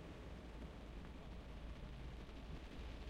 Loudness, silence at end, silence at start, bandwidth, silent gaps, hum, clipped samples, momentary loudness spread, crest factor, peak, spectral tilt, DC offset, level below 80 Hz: -55 LUFS; 0 s; 0 s; 12.5 kHz; none; none; under 0.1%; 1 LU; 12 dB; -40 dBFS; -6.5 dB/octave; under 0.1%; -54 dBFS